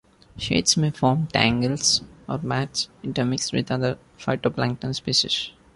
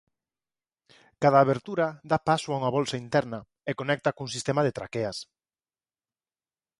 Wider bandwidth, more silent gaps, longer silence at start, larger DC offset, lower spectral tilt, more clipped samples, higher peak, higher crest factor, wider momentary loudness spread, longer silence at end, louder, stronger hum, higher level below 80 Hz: about the same, 11.5 kHz vs 11.5 kHz; neither; second, 0.35 s vs 1.2 s; neither; second, -4 dB/octave vs -5.5 dB/octave; neither; first, -2 dBFS vs -6 dBFS; about the same, 22 dB vs 22 dB; second, 8 LU vs 11 LU; second, 0.25 s vs 1.55 s; first, -23 LUFS vs -27 LUFS; neither; first, -50 dBFS vs -64 dBFS